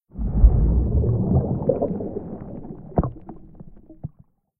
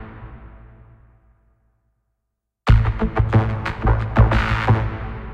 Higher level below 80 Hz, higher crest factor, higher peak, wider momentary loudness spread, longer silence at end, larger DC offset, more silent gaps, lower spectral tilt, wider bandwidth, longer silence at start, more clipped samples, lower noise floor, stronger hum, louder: about the same, -24 dBFS vs -26 dBFS; about the same, 20 dB vs 20 dB; about the same, -2 dBFS vs 0 dBFS; first, 21 LU vs 14 LU; first, 0.55 s vs 0 s; neither; neither; first, -16 dB/octave vs -8 dB/octave; second, 1.8 kHz vs 6.6 kHz; first, 0.15 s vs 0 s; neither; second, -55 dBFS vs -78 dBFS; neither; second, -22 LUFS vs -19 LUFS